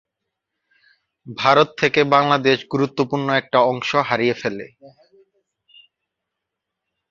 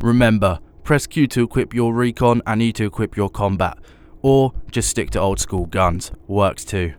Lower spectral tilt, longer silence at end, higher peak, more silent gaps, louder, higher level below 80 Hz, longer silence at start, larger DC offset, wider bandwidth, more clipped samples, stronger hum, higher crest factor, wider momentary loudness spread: about the same, -5.5 dB/octave vs -5.5 dB/octave; first, 2.2 s vs 0.05 s; about the same, -2 dBFS vs -2 dBFS; neither; about the same, -18 LUFS vs -19 LUFS; second, -62 dBFS vs -34 dBFS; first, 1.25 s vs 0 s; neither; second, 7.4 kHz vs 20 kHz; neither; neither; about the same, 20 dB vs 16 dB; first, 11 LU vs 7 LU